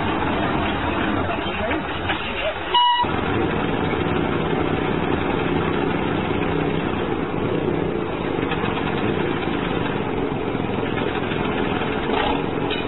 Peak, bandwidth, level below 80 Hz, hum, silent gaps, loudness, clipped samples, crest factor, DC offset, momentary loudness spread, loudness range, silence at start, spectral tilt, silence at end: -6 dBFS; 4.1 kHz; -38 dBFS; none; none; -22 LUFS; under 0.1%; 14 dB; 1%; 3 LU; 2 LU; 0 s; -11 dB/octave; 0 s